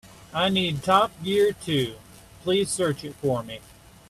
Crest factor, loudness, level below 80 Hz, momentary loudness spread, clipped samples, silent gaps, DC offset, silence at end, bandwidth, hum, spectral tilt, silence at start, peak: 20 dB; -24 LUFS; -56 dBFS; 12 LU; under 0.1%; none; under 0.1%; 0.5 s; 14.5 kHz; none; -4.5 dB/octave; 0.05 s; -6 dBFS